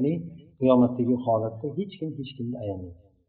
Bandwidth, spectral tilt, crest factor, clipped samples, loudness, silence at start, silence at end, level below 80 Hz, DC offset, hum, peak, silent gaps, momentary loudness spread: 4.4 kHz; -8.5 dB/octave; 18 dB; under 0.1%; -26 LUFS; 0 s; 0.35 s; -64 dBFS; under 0.1%; none; -8 dBFS; none; 15 LU